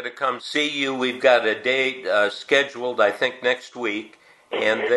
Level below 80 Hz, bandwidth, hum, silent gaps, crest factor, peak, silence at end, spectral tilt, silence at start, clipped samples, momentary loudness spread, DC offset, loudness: -72 dBFS; 12 kHz; none; none; 20 dB; -2 dBFS; 0 s; -3 dB/octave; 0 s; under 0.1%; 9 LU; under 0.1%; -22 LUFS